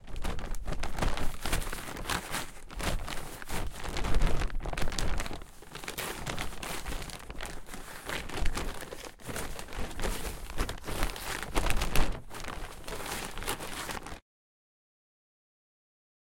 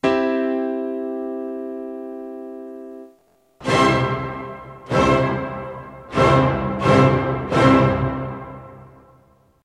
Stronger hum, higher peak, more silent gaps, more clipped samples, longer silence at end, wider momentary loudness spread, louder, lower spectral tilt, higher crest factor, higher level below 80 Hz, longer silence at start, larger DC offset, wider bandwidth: neither; second, -8 dBFS vs -2 dBFS; neither; neither; first, 2 s vs 0.75 s; second, 9 LU vs 20 LU; second, -37 LUFS vs -19 LUFS; second, -3.5 dB/octave vs -7 dB/octave; about the same, 24 dB vs 20 dB; first, -36 dBFS vs -42 dBFS; about the same, 0.05 s vs 0.05 s; neither; first, 17 kHz vs 11.5 kHz